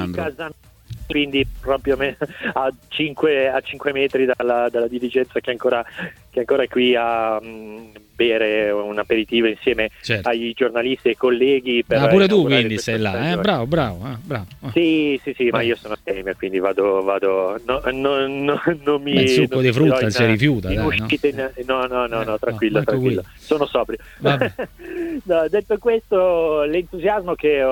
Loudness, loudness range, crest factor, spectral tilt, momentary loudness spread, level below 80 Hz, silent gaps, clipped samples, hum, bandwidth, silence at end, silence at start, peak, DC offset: -19 LUFS; 4 LU; 18 dB; -6 dB/octave; 10 LU; -44 dBFS; none; under 0.1%; none; 18 kHz; 0 s; 0 s; 0 dBFS; under 0.1%